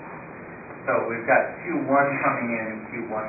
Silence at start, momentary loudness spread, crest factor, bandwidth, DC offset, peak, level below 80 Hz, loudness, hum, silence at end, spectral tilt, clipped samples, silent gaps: 0 s; 18 LU; 20 dB; 2.7 kHz; under 0.1%; -4 dBFS; -64 dBFS; -24 LUFS; none; 0 s; -14 dB/octave; under 0.1%; none